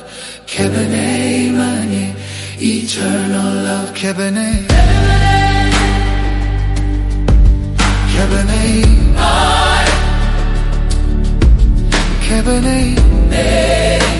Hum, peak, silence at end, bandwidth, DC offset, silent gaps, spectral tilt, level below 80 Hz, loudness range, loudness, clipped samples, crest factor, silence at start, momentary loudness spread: none; 0 dBFS; 0 s; 11.5 kHz; under 0.1%; none; -5 dB/octave; -14 dBFS; 4 LU; -14 LUFS; under 0.1%; 12 dB; 0 s; 7 LU